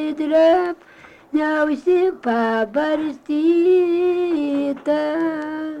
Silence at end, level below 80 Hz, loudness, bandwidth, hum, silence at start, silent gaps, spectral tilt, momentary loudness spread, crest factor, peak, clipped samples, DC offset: 0 s; -58 dBFS; -19 LUFS; 8.2 kHz; none; 0 s; none; -6 dB/octave; 8 LU; 12 dB; -6 dBFS; under 0.1%; under 0.1%